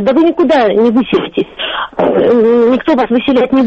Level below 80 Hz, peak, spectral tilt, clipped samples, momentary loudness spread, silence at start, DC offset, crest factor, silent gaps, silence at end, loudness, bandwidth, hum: -44 dBFS; 0 dBFS; -7 dB/octave; under 0.1%; 8 LU; 0 s; under 0.1%; 10 dB; none; 0 s; -11 LUFS; 7.6 kHz; none